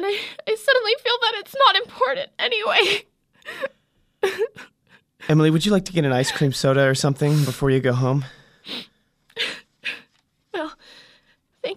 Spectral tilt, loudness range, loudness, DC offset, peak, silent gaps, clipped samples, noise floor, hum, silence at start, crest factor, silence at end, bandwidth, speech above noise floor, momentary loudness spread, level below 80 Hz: -5 dB/octave; 8 LU; -21 LUFS; under 0.1%; -2 dBFS; none; under 0.1%; -64 dBFS; none; 0 s; 20 dB; 0 s; 15.5 kHz; 44 dB; 16 LU; -54 dBFS